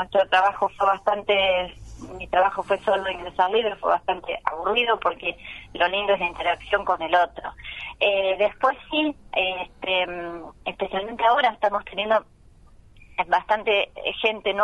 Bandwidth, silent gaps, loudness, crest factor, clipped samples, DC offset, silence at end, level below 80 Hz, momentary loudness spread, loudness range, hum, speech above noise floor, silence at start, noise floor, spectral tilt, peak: 11 kHz; none; -23 LUFS; 20 dB; under 0.1%; under 0.1%; 0 s; -52 dBFS; 13 LU; 2 LU; none; 27 dB; 0 s; -51 dBFS; -4.5 dB/octave; -4 dBFS